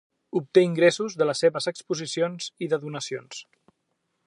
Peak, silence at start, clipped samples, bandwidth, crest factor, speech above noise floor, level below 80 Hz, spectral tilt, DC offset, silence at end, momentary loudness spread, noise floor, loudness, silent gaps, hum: -6 dBFS; 0.35 s; under 0.1%; 11 kHz; 20 dB; 52 dB; -78 dBFS; -4.5 dB/octave; under 0.1%; 0.85 s; 12 LU; -76 dBFS; -25 LUFS; none; none